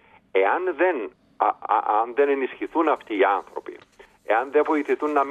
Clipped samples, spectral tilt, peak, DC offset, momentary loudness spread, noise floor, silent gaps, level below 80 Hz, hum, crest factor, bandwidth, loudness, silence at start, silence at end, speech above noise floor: under 0.1%; -5 dB/octave; -6 dBFS; under 0.1%; 7 LU; -52 dBFS; none; -70 dBFS; none; 18 dB; 8.2 kHz; -23 LUFS; 0.35 s; 0 s; 30 dB